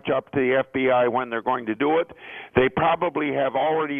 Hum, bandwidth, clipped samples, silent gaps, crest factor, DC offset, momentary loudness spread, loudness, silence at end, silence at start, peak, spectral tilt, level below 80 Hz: none; 3.7 kHz; under 0.1%; none; 18 dB; under 0.1%; 5 LU; -23 LUFS; 0 s; 0.05 s; -4 dBFS; -9 dB/octave; -54 dBFS